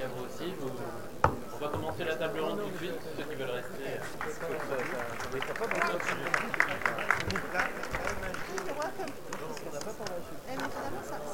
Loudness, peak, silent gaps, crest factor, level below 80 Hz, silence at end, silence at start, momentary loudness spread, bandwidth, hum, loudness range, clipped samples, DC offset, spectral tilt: -34 LUFS; -6 dBFS; none; 28 dB; -52 dBFS; 0 s; 0 s; 10 LU; over 20 kHz; none; 5 LU; under 0.1%; 0.8%; -4 dB/octave